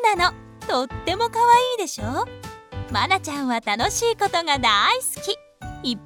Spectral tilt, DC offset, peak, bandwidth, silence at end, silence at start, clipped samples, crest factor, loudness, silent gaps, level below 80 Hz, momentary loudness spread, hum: -2.5 dB/octave; under 0.1%; -4 dBFS; 19 kHz; 0 s; 0 s; under 0.1%; 18 dB; -21 LUFS; none; -46 dBFS; 14 LU; none